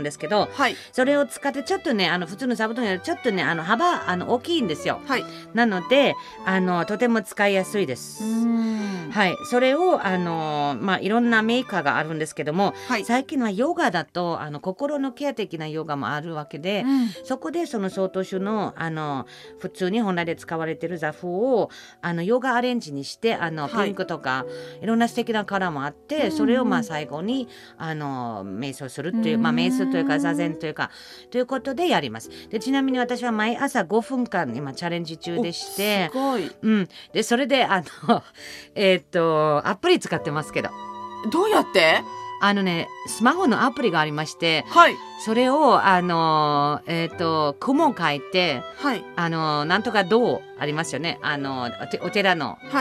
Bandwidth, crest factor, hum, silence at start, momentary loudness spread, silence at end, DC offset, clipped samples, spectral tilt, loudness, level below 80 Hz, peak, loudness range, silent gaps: 14.5 kHz; 22 dB; none; 0 s; 10 LU; 0 s; under 0.1%; under 0.1%; -5 dB/octave; -23 LUFS; -68 dBFS; 0 dBFS; 6 LU; none